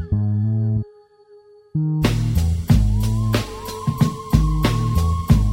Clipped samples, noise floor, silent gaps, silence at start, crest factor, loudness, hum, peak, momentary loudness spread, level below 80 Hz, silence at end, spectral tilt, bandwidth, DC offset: under 0.1%; -49 dBFS; none; 0 s; 18 dB; -20 LUFS; none; 0 dBFS; 8 LU; -26 dBFS; 0 s; -7 dB/octave; 16.5 kHz; under 0.1%